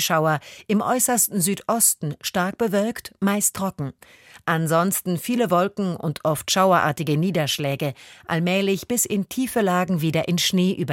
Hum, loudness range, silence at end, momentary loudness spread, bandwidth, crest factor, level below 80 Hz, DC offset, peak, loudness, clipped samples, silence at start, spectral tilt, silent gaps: none; 2 LU; 0 s; 9 LU; 17 kHz; 18 dB; -60 dBFS; under 0.1%; -4 dBFS; -22 LUFS; under 0.1%; 0 s; -4 dB/octave; none